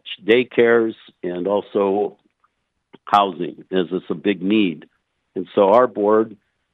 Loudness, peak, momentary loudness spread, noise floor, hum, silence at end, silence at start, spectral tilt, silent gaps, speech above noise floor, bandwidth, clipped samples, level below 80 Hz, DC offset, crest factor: -19 LUFS; -2 dBFS; 14 LU; -67 dBFS; none; 0.4 s; 0.05 s; -7.5 dB/octave; none; 49 dB; 6.4 kHz; under 0.1%; -72 dBFS; under 0.1%; 18 dB